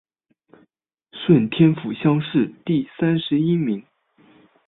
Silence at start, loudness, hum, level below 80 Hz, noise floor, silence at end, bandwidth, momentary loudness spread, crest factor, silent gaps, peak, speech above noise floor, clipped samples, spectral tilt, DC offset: 1.15 s; -20 LUFS; none; -60 dBFS; -67 dBFS; 0.85 s; 4.1 kHz; 7 LU; 18 dB; none; -4 dBFS; 48 dB; under 0.1%; -12 dB/octave; under 0.1%